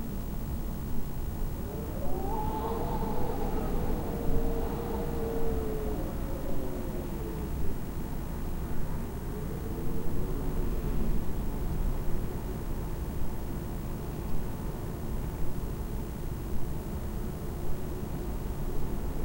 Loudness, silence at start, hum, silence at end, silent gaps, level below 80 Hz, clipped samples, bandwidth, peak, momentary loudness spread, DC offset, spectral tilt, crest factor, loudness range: -36 LUFS; 0 s; none; 0 s; none; -34 dBFS; under 0.1%; 16 kHz; -12 dBFS; 4 LU; 0.1%; -7 dB/octave; 16 dB; 4 LU